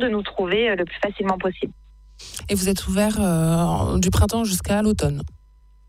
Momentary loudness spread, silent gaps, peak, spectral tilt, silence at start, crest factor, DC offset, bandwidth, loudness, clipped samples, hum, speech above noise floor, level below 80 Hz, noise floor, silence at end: 12 LU; none; -6 dBFS; -5 dB/octave; 0 s; 16 dB; under 0.1%; 16 kHz; -22 LUFS; under 0.1%; none; 30 dB; -34 dBFS; -51 dBFS; 0.6 s